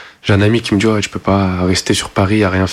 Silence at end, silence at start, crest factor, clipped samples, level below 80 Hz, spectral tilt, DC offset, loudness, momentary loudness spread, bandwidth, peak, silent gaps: 0 s; 0 s; 12 dB; under 0.1%; -38 dBFS; -5.5 dB/octave; under 0.1%; -14 LUFS; 3 LU; 13 kHz; -2 dBFS; none